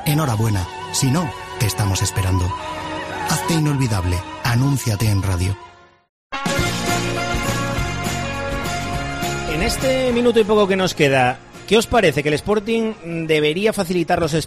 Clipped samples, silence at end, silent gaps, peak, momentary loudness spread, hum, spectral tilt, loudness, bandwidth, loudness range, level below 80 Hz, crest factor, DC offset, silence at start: under 0.1%; 0 s; 6.09-6.30 s; -4 dBFS; 8 LU; none; -5 dB/octave; -19 LUFS; 15.5 kHz; 5 LU; -36 dBFS; 16 dB; under 0.1%; 0 s